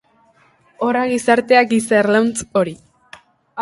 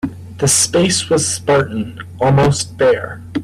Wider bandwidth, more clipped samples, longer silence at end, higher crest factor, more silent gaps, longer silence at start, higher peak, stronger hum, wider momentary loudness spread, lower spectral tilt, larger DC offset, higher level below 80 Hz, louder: second, 11.5 kHz vs 15 kHz; neither; about the same, 0 s vs 0 s; about the same, 18 dB vs 14 dB; neither; first, 0.8 s vs 0.05 s; about the same, 0 dBFS vs -2 dBFS; neither; second, 10 LU vs 13 LU; about the same, -4.5 dB/octave vs -4 dB/octave; neither; second, -56 dBFS vs -44 dBFS; about the same, -16 LUFS vs -15 LUFS